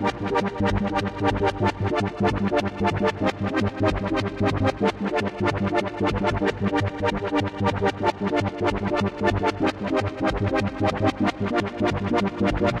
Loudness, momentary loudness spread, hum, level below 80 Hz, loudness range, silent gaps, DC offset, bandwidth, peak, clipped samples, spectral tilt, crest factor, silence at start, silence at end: -24 LUFS; 3 LU; none; -40 dBFS; 0 LU; none; under 0.1%; 10.5 kHz; -10 dBFS; under 0.1%; -7 dB/octave; 14 dB; 0 s; 0 s